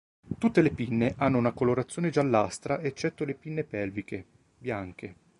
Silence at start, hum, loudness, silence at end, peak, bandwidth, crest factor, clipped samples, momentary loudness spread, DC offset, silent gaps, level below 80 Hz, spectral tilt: 0.25 s; none; -28 LUFS; 0.25 s; -8 dBFS; 11.5 kHz; 20 dB; under 0.1%; 15 LU; under 0.1%; none; -56 dBFS; -7 dB/octave